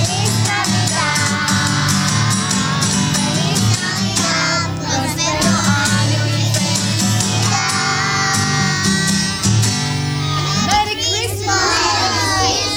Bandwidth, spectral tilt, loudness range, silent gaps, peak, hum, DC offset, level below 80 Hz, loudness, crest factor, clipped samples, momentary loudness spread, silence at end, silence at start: over 20 kHz; -3 dB/octave; 1 LU; none; -2 dBFS; none; under 0.1%; -40 dBFS; -15 LUFS; 14 dB; under 0.1%; 3 LU; 0 s; 0 s